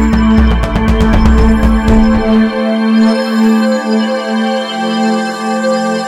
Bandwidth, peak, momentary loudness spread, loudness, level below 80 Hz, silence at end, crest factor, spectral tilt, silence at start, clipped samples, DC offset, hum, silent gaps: 11.5 kHz; 0 dBFS; 5 LU; -11 LUFS; -16 dBFS; 0 s; 10 dB; -6.5 dB/octave; 0 s; 0.2%; under 0.1%; none; none